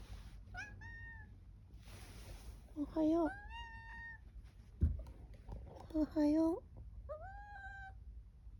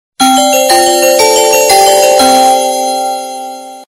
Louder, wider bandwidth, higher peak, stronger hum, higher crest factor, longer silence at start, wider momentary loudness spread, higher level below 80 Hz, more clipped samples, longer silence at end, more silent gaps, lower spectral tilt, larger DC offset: second, -41 LUFS vs -7 LUFS; about the same, 19.5 kHz vs over 20 kHz; second, -24 dBFS vs 0 dBFS; neither; first, 18 dB vs 8 dB; second, 0 s vs 0.2 s; first, 23 LU vs 14 LU; second, -52 dBFS vs -46 dBFS; second, under 0.1% vs 0.5%; about the same, 0 s vs 0.1 s; neither; first, -8 dB/octave vs -0.5 dB/octave; neither